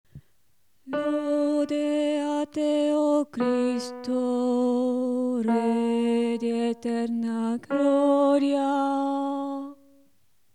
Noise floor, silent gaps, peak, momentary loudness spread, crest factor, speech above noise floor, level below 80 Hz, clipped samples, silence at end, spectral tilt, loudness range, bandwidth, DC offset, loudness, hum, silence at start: -71 dBFS; none; -12 dBFS; 7 LU; 14 dB; 47 dB; -74 dBFS; under 0.1%; 0.8 s; -5.5 dB/octave; 1 LU; 11 kHz; 0.1%; -25 LUFS; none; 0.15 s